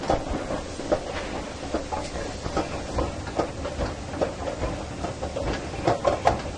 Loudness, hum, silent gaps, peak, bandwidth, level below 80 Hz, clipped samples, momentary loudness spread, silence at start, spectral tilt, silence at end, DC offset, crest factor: -29 LUFS; none; none; -6 dBFS; 11 kHz; -38 dBFS; under 0.1%; 8 LU; 0 s; -5.5 dB/octave; 0 s; under 0.1%; 22 dB